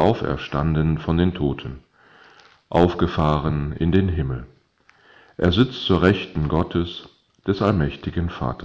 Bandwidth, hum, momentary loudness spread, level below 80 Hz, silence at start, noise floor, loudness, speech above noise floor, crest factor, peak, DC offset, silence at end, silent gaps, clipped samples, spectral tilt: 7.6 kHz; none; 12 LU; -34 dBFS; 0 s; -58 dBFS; -22 LUFS; 37 dB; 20 dB; -2 dBFS; under 0.1%; 0 s; none; under 0.1%; -8.5 dB/octave